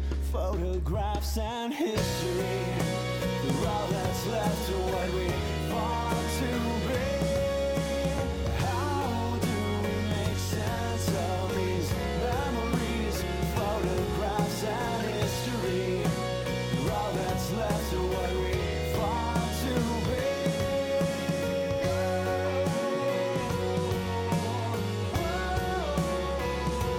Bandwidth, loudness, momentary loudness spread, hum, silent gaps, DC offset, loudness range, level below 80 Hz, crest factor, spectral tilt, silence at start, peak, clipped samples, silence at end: 17.5 kHz; -30 LUFS; 2 LU; none; none; under 0.1%; 1 LU; -38 dBFS; 14 dB; -5.5 dB/octave; 0 s; -14 dBFS; under 0.1%; 0 s